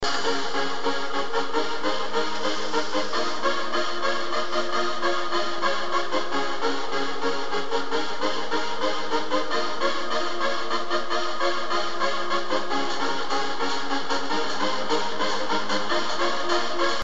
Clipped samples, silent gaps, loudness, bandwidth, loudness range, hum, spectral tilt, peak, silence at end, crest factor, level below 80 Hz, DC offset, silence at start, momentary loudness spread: under 0.1%; none; -26 LUFS; 8.2 kHz; 1 LU; none; -2.5 dB/octave; -10 dBFS; 0 s; 16 dB; -62 dBFS; 7%; 0 s; 2 LU